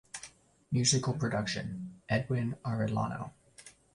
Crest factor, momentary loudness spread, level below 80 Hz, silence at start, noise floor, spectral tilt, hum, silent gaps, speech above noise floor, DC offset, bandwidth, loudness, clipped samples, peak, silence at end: 20 dB; 21 LU; -60 dBFS; 0.15 s; -57 dBFS; -4.5 dB/octave; none; none; 25 dB; under 0.1%; 11.5 kHz; -32 LUFS; under 0.1%; -14 dBFS; 0.25 s